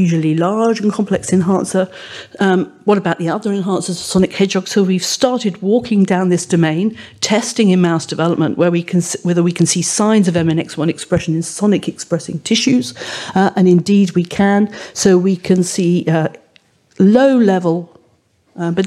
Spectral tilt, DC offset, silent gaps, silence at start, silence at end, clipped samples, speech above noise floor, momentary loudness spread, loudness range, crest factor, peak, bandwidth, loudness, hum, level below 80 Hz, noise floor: -5.5 dB/octave; under 0.1%; none; 0 s; 0 s; under 0.1%; 42 dB; 7 LU; 3 LU; 14 dB; 0 dBFS; 13 kHz; -15 LUFS; none; -52 dBFS; -56 dBFS